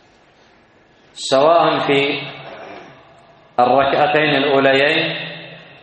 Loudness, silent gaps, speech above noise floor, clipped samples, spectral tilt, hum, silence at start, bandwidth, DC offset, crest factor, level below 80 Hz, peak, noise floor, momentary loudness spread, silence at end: -15 LUFS; none; 37 dB; under 0.1%; -4.5 dB/octave; none; 1.15 s; 8.8 kHz; under 0.1%; 18 dB; -58 dBFS; 0 dBFS; -51 dBFS; 21 LU; 0.2 s